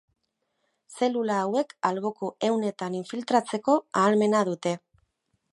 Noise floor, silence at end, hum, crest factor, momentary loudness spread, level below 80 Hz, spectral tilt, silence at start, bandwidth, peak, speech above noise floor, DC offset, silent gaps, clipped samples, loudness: -77 dBFS; 0.75 s; none; 20 dB; 9 LU; -76 dBFS; -5.5 dB/octave; 0.9 s; 11.5 kHz; -8 dBFS; 51 dB; under 0.1%; none; under 0.1%; -26 LUFS